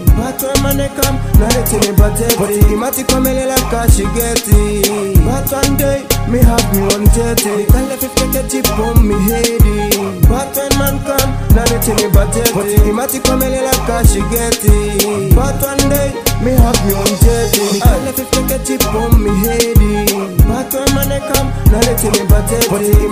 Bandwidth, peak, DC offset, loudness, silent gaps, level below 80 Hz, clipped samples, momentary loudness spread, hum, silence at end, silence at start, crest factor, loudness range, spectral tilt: 16.5 kHz; 0 dBFS; under 0.1%; -12 LUFS; none; -16 dBFS; 0.3%; 4 LU; none; 0 s; 0 s; 12 dB; 1 LU; -5 dB/octave